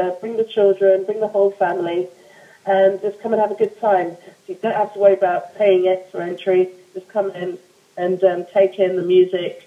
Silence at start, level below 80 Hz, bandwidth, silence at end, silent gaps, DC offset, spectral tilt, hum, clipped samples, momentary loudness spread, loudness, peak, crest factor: 0 s; -82 dBFS; 7.6 kHz; 0.1 s; none; under 0.1%; -7 dB/octave; none; under 0.1%; 12 LU; -18 LUFS; -2 dBFS; 16 dB